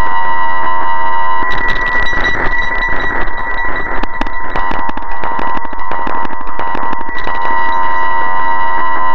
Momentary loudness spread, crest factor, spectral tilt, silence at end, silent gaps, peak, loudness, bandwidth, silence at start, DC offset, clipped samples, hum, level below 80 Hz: 6 LU; 14 dB; -5.5 dB/octave; 0 s; none; 0 dBFS; -16 LUFS; 6.2 kHz; 0 s; 40%; under 0.1%; none; -24 dBFS